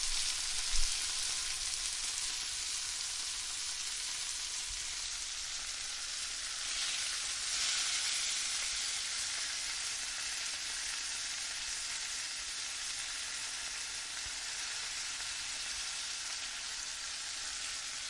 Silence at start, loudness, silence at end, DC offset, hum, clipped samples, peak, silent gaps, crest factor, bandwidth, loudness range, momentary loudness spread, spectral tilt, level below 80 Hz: 0 s; -35 LUFS; 0 s; under 0.1%; none; under 0.1%; -14 dBFS; none; 24 dB; 11.5 kHz; 4 LU; 5 LU; 2.5 dB/octave; -52 dBFS